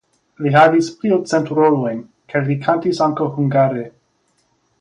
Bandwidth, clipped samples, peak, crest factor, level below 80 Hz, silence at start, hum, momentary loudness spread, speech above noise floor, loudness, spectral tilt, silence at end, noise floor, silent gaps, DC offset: 10.5 kHz; under 0.1%; 0 dBFS; 16 dB; -62 dBFS; 0.4 s; none; 12 LU; 48 dB; -17 LUFS; -7 dB/octave; 0.9 s; -63 dBFS; none; under 0.1%